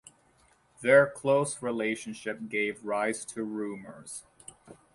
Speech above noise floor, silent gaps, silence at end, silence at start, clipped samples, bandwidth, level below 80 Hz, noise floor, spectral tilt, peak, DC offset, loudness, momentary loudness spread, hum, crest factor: 36 dB; none; 0.2 s; 0.8 s; under 0.1%; 11.5 kHz; -72 dBFS; -65 dBFS; -4.5 dB/octave; -8 dBFS; under 0.1%; -29 LUFS; 21 LU; none; 22 dB